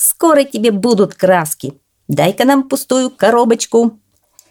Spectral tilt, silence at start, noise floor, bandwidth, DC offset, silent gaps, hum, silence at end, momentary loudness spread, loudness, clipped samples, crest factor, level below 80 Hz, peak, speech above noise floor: -4 dB/octave; 0 s; -51 dBFS; 19.5 kHz; under 0.1%; none; none; 0.6 s; 8 LU; -13 LUFS; under 0.1%; 14 dB; -62 dBFS; 0 dBFS; 38 dB